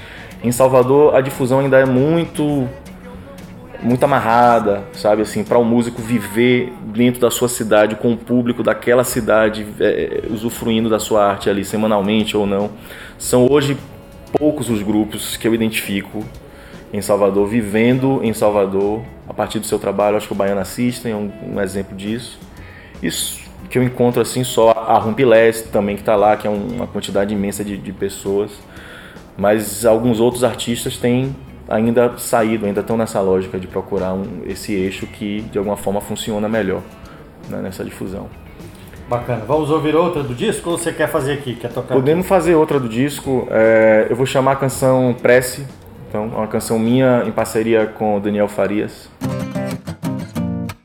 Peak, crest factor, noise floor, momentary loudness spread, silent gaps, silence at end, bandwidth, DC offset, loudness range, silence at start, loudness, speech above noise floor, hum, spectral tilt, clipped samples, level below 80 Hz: 0 dBFS; 16 dB; -37 dBFS; 14 LU; none; 0.1 s; 18.5 kHz; under 0.1%; 7 LU; 0 s; -17 LUFS; 21 dB; none; -5.5 dB/octave; under 0.1%; -44 dBFS